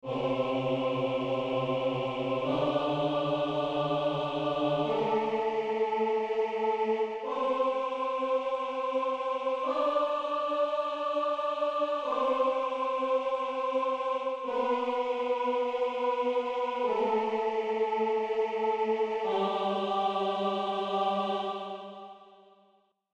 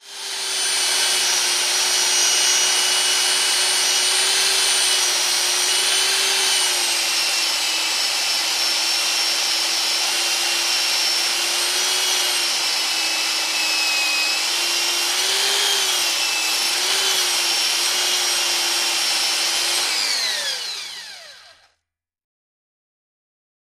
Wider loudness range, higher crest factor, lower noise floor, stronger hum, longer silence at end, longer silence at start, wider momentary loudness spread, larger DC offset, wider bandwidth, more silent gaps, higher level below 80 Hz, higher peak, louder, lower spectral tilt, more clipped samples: second, 1 LU vs 4 LU; about the same, 14 dB vs 16 dB; second, -68 dBFS vs -78 dBFS; neither; second, 0.9 s vs 2.3 s; about the same, 0.05 s vs 0.05 s; about the same, 3 LU vs 3 LU; neither; second, 8.6 kHz vs 15.5 kHz; neither; about the same, -68 dBFS vs -72 dBFS; second, -16 dBFS vs -4 dBFS; second, -30 LUFS vs -17 LUFS; first, -6.5 dB/octave vs 3 dB/octave; neither